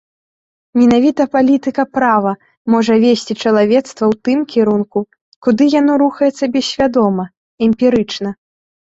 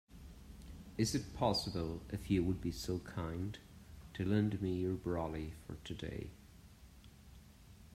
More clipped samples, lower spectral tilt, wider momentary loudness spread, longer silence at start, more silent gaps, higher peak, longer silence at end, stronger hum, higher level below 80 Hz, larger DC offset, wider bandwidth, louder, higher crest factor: neither; about the same, -6 dB/octave vs -6 dB/octave; second, 9 LU vs 25 LU; first, 0.75 s vs 0.1 s; first, 2.57-2.65 s, 5.21-5.42 s, 7.37-7.57 s vs none; first, -2 dBFS vs -18 dBFS; first, 0.55 s vs 0 s; neither; about the same, -52 dBFS vs -56 dBFS; neither; second, 8 kHz vs 16 kHz; first, -14 LUFS vs -39 LUFS; second, 12 dB vs 22 dB